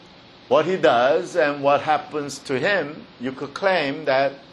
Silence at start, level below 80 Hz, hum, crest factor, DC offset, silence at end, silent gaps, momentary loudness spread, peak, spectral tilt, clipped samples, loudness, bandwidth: 0.5 s; -64 dBFS; none; 18 dB; under 0.1%; 0.1 s; none; 12 LU; -4 dBFS; -4.5 dB/octave; under 0.1%; -21 LUFS; 12 kHz